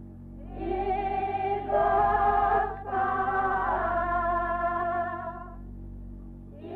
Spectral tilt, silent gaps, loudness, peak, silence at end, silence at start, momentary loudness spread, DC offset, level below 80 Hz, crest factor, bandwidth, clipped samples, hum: -8.5 dB/octave; none; -27 LUFS; -14 dBFS; 0 s; 0 s; 21 LU; under 0.1%; -44 dBFS; 14 dB; 4.7 kHz; under 0.1%; none